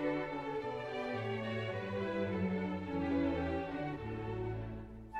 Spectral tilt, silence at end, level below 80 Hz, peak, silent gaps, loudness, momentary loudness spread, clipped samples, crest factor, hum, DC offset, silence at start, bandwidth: -8 dB/octave; 0 s; -56 dBFS; -22 dBFS; none; -38 LUFS; 6 LU; under 0.1%; 16 dB; none; under 0.1%; 0 s; 8.8 kHz